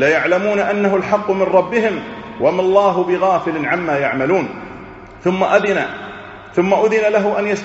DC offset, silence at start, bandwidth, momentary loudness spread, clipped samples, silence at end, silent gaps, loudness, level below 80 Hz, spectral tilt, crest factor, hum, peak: under 0.1%; 0 s; 8 kHz; 15 LU; under 0.1%; 0 s; none; -16 LUFS; -52 dBFS; -4.5 dB/octave; 16 dB; none; 0 dBFS